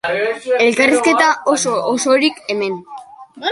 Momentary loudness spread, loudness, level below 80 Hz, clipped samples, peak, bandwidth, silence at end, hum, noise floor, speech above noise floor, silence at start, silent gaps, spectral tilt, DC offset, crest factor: 12 LU; -15 LUFS; -60 dBFS; under 0.1%; 0 dBFS; 11.5 kHz; 0 s; none; -35 dBFS; 20 dB; 0.05 s; none; -2.5 dB/octave; under 0.1%; 16 dB